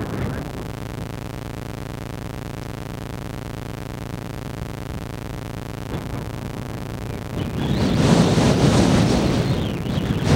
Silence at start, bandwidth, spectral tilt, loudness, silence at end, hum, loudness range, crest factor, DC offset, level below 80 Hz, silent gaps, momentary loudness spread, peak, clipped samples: 0 s; 16.5 kHz; -6 dB/octave; -23 LUFS; 0 s; none; 12 LU; 20 dB; under 0.1%; -36 dBFS; none; 15 LU; -2 dBFS; under 0.1%